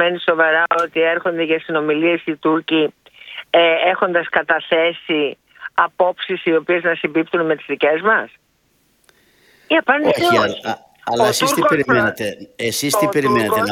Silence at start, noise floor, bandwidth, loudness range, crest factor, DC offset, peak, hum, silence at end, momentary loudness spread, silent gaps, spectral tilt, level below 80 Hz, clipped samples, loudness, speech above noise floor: 0 s; -61 dBFS; 18 kHz; 2 LU; 18 dB; under 0.1%; 0 dBFS; none; 0 s; 9 LU; none; -4 dB/octave; -58 dBFS; under 0.1%; -17 LUFS; 44 dB